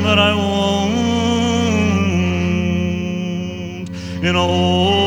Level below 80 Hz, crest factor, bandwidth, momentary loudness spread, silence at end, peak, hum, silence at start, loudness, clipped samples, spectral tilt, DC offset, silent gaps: -40 dBFS; 16 dB; 10 kHz; 11 LU; 0 s; -2 dBFS; none; 0 s; -17 LUFS; under 0.1%; -5.5 dB/octave; under 0.1%; none